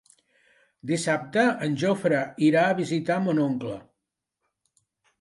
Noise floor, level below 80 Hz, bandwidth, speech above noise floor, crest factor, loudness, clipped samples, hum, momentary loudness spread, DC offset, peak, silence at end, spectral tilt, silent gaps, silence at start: -84 dBFS; -70 dBFS; 11.5 kHz; 60 dB; 18 dB; -24 LUFS; under 0.1%; none; 10 LU; under 0.1%; -8 dBFS; 1.4 s; -6 dB/octave; none; 0.85 s